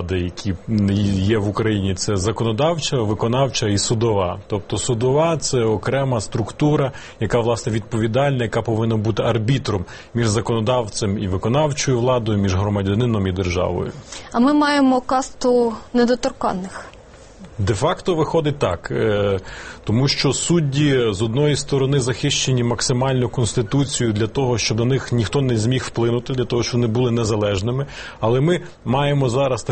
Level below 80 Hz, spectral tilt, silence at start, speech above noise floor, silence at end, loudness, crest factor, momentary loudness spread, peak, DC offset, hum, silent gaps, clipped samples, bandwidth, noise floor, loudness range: -42 dBFS; -5.5 dB/octave; 0 s; 23 dB; 0 s; -19 LUFS; 16 dB; 6 LU; -4 dBFS; 0.2%; none; none; under 0.1%; 8.8 kHz; -42 dBFS; 2 LU